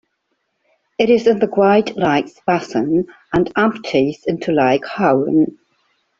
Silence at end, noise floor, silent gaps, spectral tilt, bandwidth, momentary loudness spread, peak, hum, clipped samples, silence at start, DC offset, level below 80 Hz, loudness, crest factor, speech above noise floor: 0.7 s; -70 dBFS; none; -6.5 dB/octave; 7.6 kHz; 6 LU; -2 dBFS; none; under 0.1%; 1 s; under 0.1%; -52 dBFS; -17 LUFS; 14 dB; 54 dB